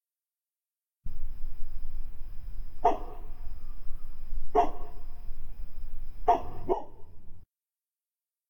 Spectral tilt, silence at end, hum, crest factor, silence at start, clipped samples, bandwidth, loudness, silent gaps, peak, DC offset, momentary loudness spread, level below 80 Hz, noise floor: -7.5 dB/octave; 1.05 s; none; 18 dB; 1.05 s; under 0.1%; 3.5 kHz; -32 LUFS; none; -10 dBFS; under 0.1%; 19 LU; -36 dBFS; under -90 dBFS